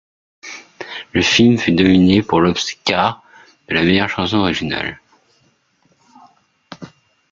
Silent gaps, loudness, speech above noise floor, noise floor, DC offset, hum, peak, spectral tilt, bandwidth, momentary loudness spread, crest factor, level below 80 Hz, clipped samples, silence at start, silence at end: none; -15 LUFS; 45 dB; -60 dBFS; under 0.1%; none; -2 dBFS; -5 dB/octave; 7.6 kHz; 22 LU; 16 dB; -50 dBFS; under 0.1%; 0.45 s; 0.45 s